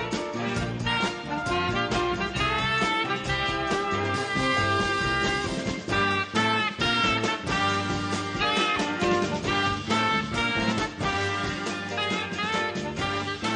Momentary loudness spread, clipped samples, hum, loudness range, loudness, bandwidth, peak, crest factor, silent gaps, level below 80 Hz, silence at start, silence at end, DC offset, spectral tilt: 5 LU; under 0.1%; none; 2 LU; -26 LUFS; 10.5 kHz; -10 dBFS; 16 dB; none; -46 dBFS; 0 s; 0 s; under 0.1%; -4 dB/octave